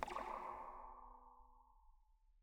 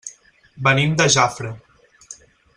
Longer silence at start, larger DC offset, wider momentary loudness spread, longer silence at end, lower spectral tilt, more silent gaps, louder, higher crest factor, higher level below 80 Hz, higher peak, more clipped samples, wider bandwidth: about the same, 0 s vs 0.05 s; neither; second, 18 LU vs 21 LU; second, 0 s vs 0.45 s; about the same, -4 dB/octave vs -3.5 dB/octave; neither; second, -51 LUFS vs -17 LUFS; first, 28 dB vs 20 dB; second, -66 dBFS vs -54 dBFS; second, -24 dBFS vs 0 dBFS; neither; first, over 20 kHz vs 11 kHz